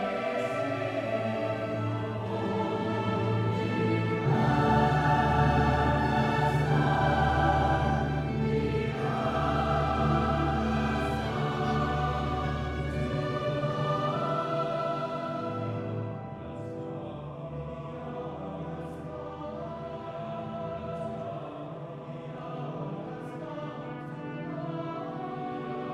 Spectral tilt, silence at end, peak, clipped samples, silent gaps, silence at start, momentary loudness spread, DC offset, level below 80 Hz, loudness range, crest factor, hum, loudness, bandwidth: -7.5 dB/octave; 0 s; -12 dBFS; under 0.1%; none; 0 s; 14 LU; under 0.1%; -42 dBFS; 13 LU; 18 dB; none; -30 LUFS; 11 kHz